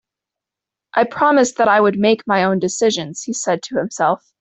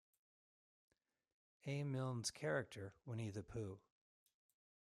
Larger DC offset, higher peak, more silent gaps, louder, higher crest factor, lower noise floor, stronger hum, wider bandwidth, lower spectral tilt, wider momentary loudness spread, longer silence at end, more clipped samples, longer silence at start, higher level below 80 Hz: neither; first, -2 dBFS vs -30 dBFS; neither; first, -17 LUFS vs -47 LUFS; about the same, 16 dB vs 20 dB; second, -86 dBFS vs under -90 dBFS; neither; second, 8.4 kHz vs 14.5 kHz; about the same, -4 dB/octave vs -5 dB/octave; about the same, 9 LU vs 11 LU; second, 0.25 s vs 1.1 s; neither; second, 0.95 s vs 1.65 s; first, -60 dBFS vs -76 dBFS